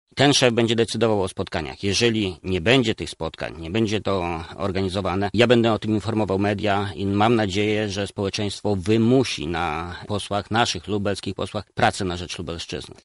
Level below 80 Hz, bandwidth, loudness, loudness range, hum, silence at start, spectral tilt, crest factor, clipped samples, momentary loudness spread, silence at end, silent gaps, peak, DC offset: -48 dBFS; 11.5 kHz; -22 LUFS; 3 LU; none; 0.15 s; -5 dB/octave; 20 dB; under 0.1%; 11 LU; 0.1 s; none; -2 dBFS; under 0.1%